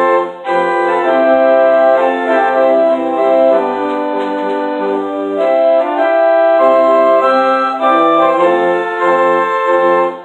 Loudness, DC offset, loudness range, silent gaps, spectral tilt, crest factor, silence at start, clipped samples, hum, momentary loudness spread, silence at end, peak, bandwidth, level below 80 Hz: -12 LUFS; under 0.1%; 3 LU; none; -6 dB/octave; 12 dB; 0 s; under 0.1%; none; 7 LU; 0 s; 0 dBFS; 8.4 kHz; -62 dBFS